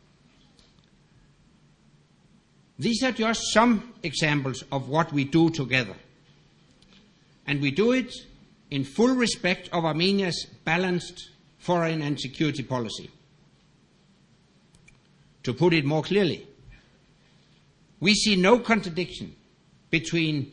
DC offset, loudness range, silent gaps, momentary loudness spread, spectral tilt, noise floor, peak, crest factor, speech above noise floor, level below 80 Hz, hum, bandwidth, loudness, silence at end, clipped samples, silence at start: under 0.1%; 6 LU; none; 14 LU; -5 dB/octave; -60 dBFS; -4 dBFS; 22 dB; 36 dB; -56 dBFS; none; 10.5 kHz; -25 LUFS; 0 s; under 0.1%; 2.8 s